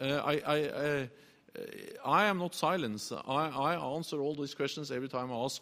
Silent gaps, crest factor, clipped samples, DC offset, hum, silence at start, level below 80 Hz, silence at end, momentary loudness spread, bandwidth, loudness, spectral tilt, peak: none; 20 dB; under 0.1%; under 0.1%; none; 0 s; -72 dBFS; 0 s; 15 LU; 15.5 kHz; -33 LUFS; -4.5 dB/octave; -14 dBFS